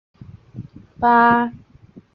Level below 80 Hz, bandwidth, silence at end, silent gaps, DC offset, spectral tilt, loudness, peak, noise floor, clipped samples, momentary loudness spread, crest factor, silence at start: -52 dBFS; 5.2 kHz; 0.6 s; none; under 0.1%; -8.5 dB/octave; -16 LUFS; -2 dBFS; -47 dBFS; under 0.1%; 25 LU; 18 dB; 0.55 s